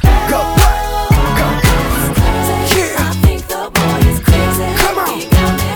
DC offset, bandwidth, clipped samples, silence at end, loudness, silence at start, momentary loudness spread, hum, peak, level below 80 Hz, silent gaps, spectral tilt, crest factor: under 0.1%; over 20 kHz; under 0.1%; 0 s; -13 LUFS; 0 s; 3 LU; none; 0 dBFS; -16 dBFS; none; -5 dB/octave; 12 dB